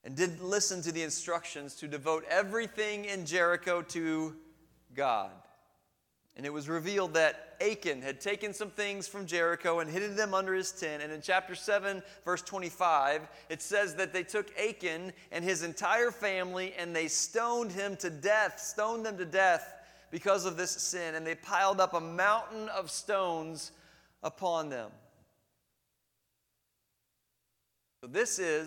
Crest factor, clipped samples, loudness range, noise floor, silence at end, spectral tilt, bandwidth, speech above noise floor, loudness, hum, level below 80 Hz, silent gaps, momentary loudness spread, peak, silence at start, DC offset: 22 dB; under 0.1%; 6 LU; -81 dBFS; 0 s; -2.5 dB/octave; 19 kHz; 48 dB; -32 LUFS; none; -74 dBFS; none; 11 LU; -12 dBFS; 0.05 s; under 0.1%